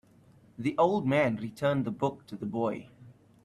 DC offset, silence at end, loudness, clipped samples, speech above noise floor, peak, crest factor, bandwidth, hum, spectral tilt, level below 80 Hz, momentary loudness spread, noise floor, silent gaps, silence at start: under 0.1%; 0.35 s; -30 LUFS; under 0.1%; 30 dB; -12 dBFS; 20 dB; 13 kHz; none; -7.5 dB/octave; -66 dBFS; 10 LU; -59 dBFS; none; 0.6 s